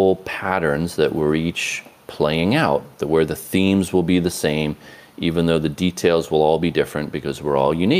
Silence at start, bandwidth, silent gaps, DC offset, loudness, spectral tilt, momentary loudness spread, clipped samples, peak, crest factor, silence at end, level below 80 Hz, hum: 0 s; 16 kHz; none; under 0.1%; -20 LUFS; -5.5 dB/octave; 7 LU; under 0.1%; -4 dBFS; 16 dB; 0 s; -46 dBFS; none